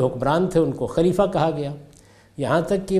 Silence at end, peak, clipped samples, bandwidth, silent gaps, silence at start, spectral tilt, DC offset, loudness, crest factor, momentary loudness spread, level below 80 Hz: 0 s; -4 dBFS; under 0.1%; 14.5 kHz; none; 0 s; -7 dB/octave; under 0.1%; -22 LUFS; 16 dB; 10 LU; -46 dBFS